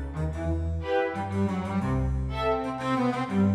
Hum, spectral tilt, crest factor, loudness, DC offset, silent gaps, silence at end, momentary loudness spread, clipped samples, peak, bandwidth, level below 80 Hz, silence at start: none; -8 dB/octave; 14 dB; -28 LUFS; under 0.1%; none; 0 s; 3 LU; under 0.1%; -14 dBFS; 11 kHz; -36 dBFS; 0 s